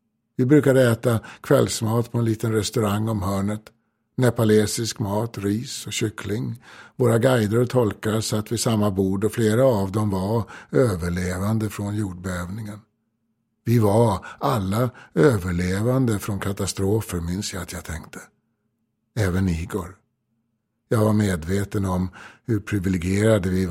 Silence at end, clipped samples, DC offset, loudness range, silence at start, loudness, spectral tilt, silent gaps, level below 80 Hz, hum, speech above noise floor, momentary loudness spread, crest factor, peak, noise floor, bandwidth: 0 s; under 0.1%; under 0.1%; 6 LU; 0.4 s; -22 LUFS; -6 dB/octave; none; -48 dBFS; none; 52 dB; 13 LU; 18 dB; -4 dBFS; -73 dBFS; 16.5 kHz